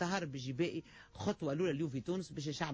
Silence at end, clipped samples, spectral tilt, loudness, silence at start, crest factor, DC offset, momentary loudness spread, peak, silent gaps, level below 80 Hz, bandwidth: 0 s; under 0.1%; -5.5 dB/octave; -39 LUFS; 0 s; 14 dB; under 0.1%; 6 LU; -24 dBFS; none; -66 dBFS; 8 kHz